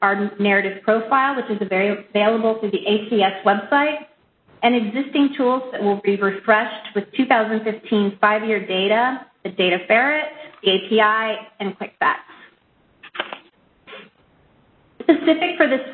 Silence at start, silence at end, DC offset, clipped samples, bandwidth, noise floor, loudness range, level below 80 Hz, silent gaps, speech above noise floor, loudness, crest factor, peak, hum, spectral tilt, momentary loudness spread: 0 s; 0 s; under 0.1%; under 0.1%; 4.5 kHz; -58 dBFS; 6 LU; -68 dBFS; none; 40 dB; -19 LUFS; 20 dB; 0 dBFS; none; -10 dB/octave; 11 LU